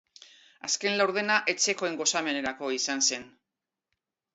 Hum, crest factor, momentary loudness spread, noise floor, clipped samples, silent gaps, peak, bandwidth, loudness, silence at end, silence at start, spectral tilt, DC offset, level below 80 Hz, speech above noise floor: none; 22 dB; 6 LU; -88 dBFS; under 0.1%; none; -8 dBFS; 8.2 kHz; -27 LUFS; 1.05 s; 0.65 s; -1 dB/octave; under 0.1%; -74 dBFS; 60 dB